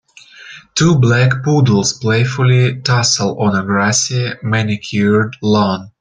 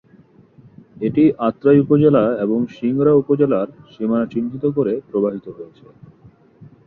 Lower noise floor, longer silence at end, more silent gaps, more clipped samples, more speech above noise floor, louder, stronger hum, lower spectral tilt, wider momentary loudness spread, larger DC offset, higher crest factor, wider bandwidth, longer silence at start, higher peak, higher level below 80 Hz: second, -39 dBFS vs -49 dBFS; about the same, 0.1 s vs 0.2 s; neither; neither; second, 25 dB vs 32 dB; first, -14 LUFS vs -17 LUFS; neither; second, -5 dB/octave vs -11 dB/octave; second, 6 LU vs 12 LU; neither; about the same, 14 dB vs 16 dB; first, 9.4 kHz vs 4.3 kHz; second, 0.4 s vs 1 s; about the same, 0 dBFS vs -2 dBFS; first, -48 dBFS vs -56 dBFS